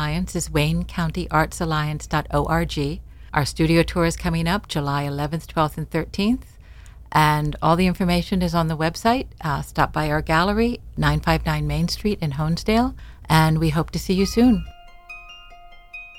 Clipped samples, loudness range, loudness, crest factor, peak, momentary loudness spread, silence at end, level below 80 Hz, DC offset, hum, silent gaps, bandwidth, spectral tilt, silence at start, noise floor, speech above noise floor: under 0.1%; 2 LU; -22 LUFS; 18 dB; -4 dBFS; 8 LU; 0 s; -34 dBFS; under 0.1%; none; none; 16.5 kHz; -6 dB/octave; 0 s; -44 dBFS; 23 dB